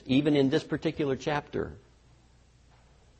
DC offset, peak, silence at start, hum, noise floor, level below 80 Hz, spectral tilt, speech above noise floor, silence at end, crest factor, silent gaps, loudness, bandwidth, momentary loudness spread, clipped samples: under 0.1%; -14 dBFS; 0.05 s; none; -60 dBFS; -56 dBFS; -6.5 dB/octave; 32 dB; 1.4 s; 16 dB; none; -29 LUFS; 8.4 kHz; 11 LU; under 0.1%